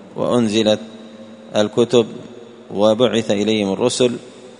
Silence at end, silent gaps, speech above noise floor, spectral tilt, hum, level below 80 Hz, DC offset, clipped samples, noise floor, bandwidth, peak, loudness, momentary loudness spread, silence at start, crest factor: 0.05 s; none; 21 dB; -5 dB/octave; none; -58 dBFS; under 0.1%; under 0.1%; -38 dBFS; 10.5 kHz; 0 dBFS; -17 LUFS; 20 LU; 0 s; 18 dB